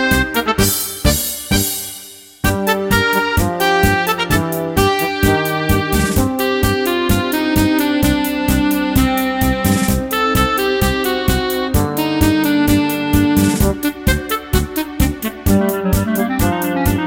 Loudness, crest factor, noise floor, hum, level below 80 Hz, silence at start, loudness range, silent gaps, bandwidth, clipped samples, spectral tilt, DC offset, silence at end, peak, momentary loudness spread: -16 LUFS; 16 dB; -36 dBFS; none; -26 dBFS; 0 s; 1 LU; none; 17.5 kHz; under 0.1%; -4.5 dB/octave; under 0.1%; 0 s; 0 dBFS; 4 LU